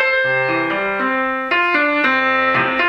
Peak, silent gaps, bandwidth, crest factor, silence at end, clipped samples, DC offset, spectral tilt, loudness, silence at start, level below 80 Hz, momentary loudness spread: -2 dBFS; none; 8.2 kHz; 14 dB; 0 s; under 0.1%; under 0.1%; -5.5 dB/octave; -16 LUFS; 0 s; -54 dBFS; 4 LU